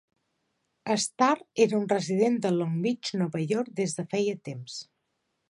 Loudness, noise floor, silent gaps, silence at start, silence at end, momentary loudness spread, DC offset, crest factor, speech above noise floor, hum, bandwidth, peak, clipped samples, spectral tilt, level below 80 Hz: -27 LUFS; -78 dBFS; none; 0.85 s; 0.65 s; 13 LU; under 0.1%; 20 dB; 51 dB; none; 11.5 kHz; -8 dBFS; under 0.1%; -5 dB/octave; -76 dBFS